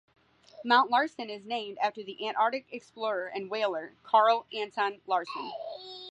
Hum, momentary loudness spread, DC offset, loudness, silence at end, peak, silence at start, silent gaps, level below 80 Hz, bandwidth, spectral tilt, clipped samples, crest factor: none; 16 LU; under 0.1%; -29 LUFS; 0 s; -10 dBFS; 0.55 s; none; -82 dBFS; 9.6 kHz; -4 dB/octave; under 0.1%; 20 dB